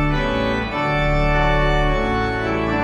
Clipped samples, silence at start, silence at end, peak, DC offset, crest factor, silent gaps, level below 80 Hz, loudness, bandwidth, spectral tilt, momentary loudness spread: under 0.1%; 0 s; 0 s; -6 dBFS; under 0.1%; 12 dB; none; -24 dBFS; -19 LUFS; 9.4 kHz; -7 dB/octave; 3 LU